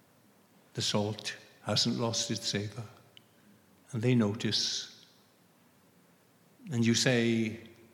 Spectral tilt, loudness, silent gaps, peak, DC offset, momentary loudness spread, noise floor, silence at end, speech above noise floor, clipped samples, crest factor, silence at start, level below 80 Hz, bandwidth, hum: -4 dB/octave; -31 LUFS; none; -12 dBFS; under 0.1%; 16 LU; -64 dBFS; 0.2 s; 34 dB; under 0.1%; 22 dB; 0.75 s; -78 dBFS; 16.5 kHz; none